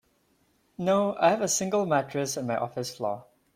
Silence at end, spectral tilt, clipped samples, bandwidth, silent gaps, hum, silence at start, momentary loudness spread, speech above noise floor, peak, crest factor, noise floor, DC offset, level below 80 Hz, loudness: 0.35 s; -4 dB/octave; under 0.1%; 16.5 kHz; none; none; 0.8 s; 10 LU; 41 dB; -10 dBFS; 18 dB; -68 dBFS; under 0.1%; -70 dBFS; -27 LUFS